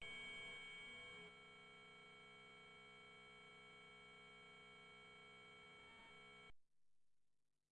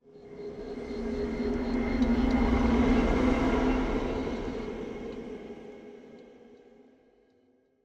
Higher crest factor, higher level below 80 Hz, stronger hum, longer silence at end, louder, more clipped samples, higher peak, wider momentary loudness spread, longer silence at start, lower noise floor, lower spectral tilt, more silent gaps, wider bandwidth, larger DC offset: about the same, 18 dB vs 16 dB; second, -84 dBFS vs -38 dBFS; neither; second, 0.2 s vs 1.3 s; second, -59 LUFS vs -29 LUFS; neither; second, -42 dBFS vs -14 dBFS; second, 9 LU vs 20 LU; about the same, 0 s vs 0.1 s; first, -86 dBFS vs -67 dBFS; second, -2.5 dB/octave vs -7.5 dB/octave; neither; first, 9.6 kHz vs 8 kHz; neither